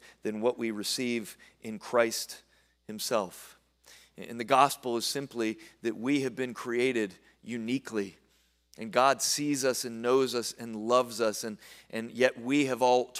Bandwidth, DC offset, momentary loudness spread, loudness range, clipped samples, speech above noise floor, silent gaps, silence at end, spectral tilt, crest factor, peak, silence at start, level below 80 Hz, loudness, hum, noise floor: 16 kHz; under 0.1%; 16 LU; 5 LU; under 0.1%; 39 dB; none; 0 s; -3.5 dB/octave; 22 dB; -8 dBFS; 0.05 s; -74 dBFS; -30 LUFS; none; -69 dBFS